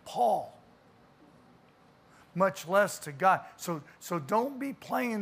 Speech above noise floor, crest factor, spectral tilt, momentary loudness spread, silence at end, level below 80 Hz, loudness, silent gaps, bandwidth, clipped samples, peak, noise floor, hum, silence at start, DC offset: 31 dB; 20 dB; -5 dB/octave; 12 LU; 0 s; -76 dBFS; -30 LUFS; none; 15.5 kHz; under 0.1%; -12 dBFS; -61 dBFS; none; 0.05 s; under 0.1%